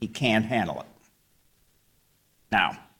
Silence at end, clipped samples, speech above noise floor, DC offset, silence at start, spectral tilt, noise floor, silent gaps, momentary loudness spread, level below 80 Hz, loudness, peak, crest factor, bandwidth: 0.2 s; under 0.1%; 41 dB; under 0.1%; 0 s; -5 dB/octave; -66 dBFS; none; 14 LU; -58 dBFS; -26 LUFS; -8 dBFS; 22 dB; 17 kHz